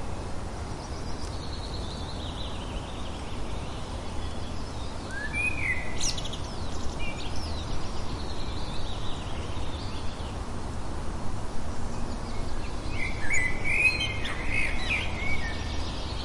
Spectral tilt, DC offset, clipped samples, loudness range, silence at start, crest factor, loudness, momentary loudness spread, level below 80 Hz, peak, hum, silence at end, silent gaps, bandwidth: -4 dB/octave; under 0.1%; under 0.1%; 9 LU; 0 s; 18 dB; -32 LUFS; 10 LU; -36 dBFS; -10 dBFS; none; 0 s; none; 11.5 kHz